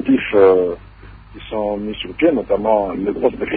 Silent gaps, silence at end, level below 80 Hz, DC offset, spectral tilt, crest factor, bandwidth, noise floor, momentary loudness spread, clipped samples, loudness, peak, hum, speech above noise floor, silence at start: none; 0 s; -42 dBFS; under 0.1%; -11 dB/octave; 16 dB; 4.6 kHz; -39 dBFS; 14 LU; under 0.1%; -17 LUFS; -2 dBFS; none; 23 dB; 0 s